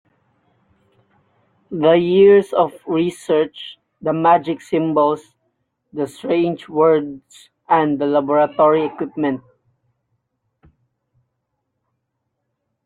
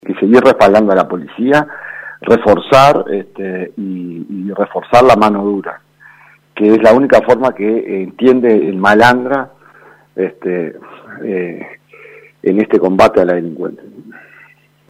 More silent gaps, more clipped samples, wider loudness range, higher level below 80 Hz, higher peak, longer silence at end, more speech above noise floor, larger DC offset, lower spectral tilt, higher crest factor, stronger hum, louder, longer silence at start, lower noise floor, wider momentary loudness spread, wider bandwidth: neither; second, under 0.1% vs 0.5%; about the same, 6 LU vs 5 LU; second, -64 dBFS vs -46 dBFS; about the same, -2 dBFS vs 0 dBFS; first, 3.5 s vs 0.8 s; first, 58 dB vs 35 dB; neither; about the same, -7 dB/octave vs -6.5 dB/octave; about the same, 16 dB vs 12 dB; second, none vs 50 Hz at -55 dBFS; second, -17 LUFS vs -11 LUFS; first, 1.7 s vs 0.05 s; first, -75 dBFS vs -46 dBFS; second, 14 LU vs 17 LU; second, 11 kHz vs 15.5 kHz